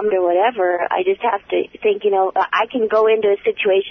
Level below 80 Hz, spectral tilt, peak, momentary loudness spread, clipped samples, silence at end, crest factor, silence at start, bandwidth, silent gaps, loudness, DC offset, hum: -62 dBFS; -6 dB/octave; -4 dBFS; 4 LU; under 0.1%; 0 s; 12 dB; 0 s; 6 kHz; none; -17 LUFS; under 0.1%; none